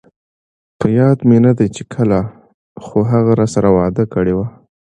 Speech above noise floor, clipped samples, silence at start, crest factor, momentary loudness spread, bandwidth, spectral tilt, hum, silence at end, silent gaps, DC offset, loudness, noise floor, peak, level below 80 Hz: over 77 dB; under 0.1%; 0.8 s; 14 dB; 10 LU; 9.8 kHz; -8.5 dB/octave; none; 0.45 s; 2.54-2.75 s; under 0.1%; -14 LUFS; under -90 dBFS; 0 dBFS; -42 dBFS